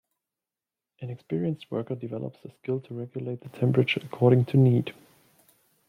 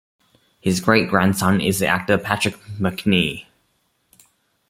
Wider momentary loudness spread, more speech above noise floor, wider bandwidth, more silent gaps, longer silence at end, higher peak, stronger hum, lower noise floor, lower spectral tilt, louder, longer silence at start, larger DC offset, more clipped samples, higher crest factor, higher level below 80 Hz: first, 18 LU vs 8 LU; first, over 64 dB vs 48 dB; second, 4.7 kHz vs 16 kHz; neither; second, 1 s vs 1.25 s; second, -8 dBFS vs -2 dBFS; neither; first, under -90 dBFS vs -67 dBFS; first, -9 dB/octave vs -5 dB/octave; second, -26 LUFS vs -19 LUFS; first, 1 s vs 0.65 s; neither; neither; about the same, 20 dB vs 20 dB; second, -70 dBFS vs -54 dBFS